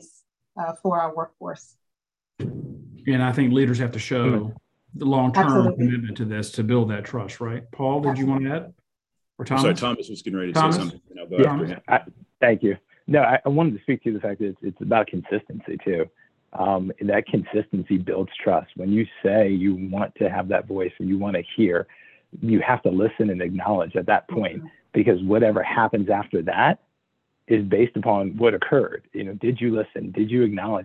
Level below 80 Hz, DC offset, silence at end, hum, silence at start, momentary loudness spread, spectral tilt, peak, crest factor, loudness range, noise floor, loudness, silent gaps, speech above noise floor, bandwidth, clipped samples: -56 dBFS; under 0.1%; 0 s; none; 0.55 s; 12 LU; -7 dB/octave; -4 dBFS; 20 dB; 4 LU; -84 dBFS; -23 LUFS; none; 62 dB; 12 kHz; under 0.1%